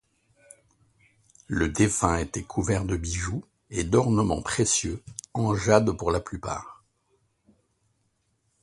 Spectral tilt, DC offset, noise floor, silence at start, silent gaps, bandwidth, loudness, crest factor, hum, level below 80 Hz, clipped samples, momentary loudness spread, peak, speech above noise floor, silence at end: -5 dB/octave; under 0.1%; -72 dBFS; 1.5 s; none; 11.5 kHz; -26 LUFS; 26 dB; none; -42 dBFS; under 0.1%; 13 LU; -2 dBFS; 47 dB; 1.9 s